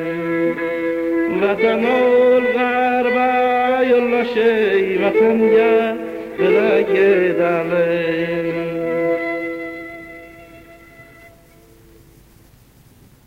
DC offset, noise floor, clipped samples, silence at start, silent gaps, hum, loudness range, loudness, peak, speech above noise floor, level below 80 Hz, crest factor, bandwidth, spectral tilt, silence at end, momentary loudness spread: under 0.1%; -48 dBFS; under 0.1%; 0 s; none; none; 10 LU; -17 LUFS; -6 dBFS; 33 dB; -54 dBFS; 12 dB; 15.5 kHz; -7 dB/octave; 2.25 s; 11 LU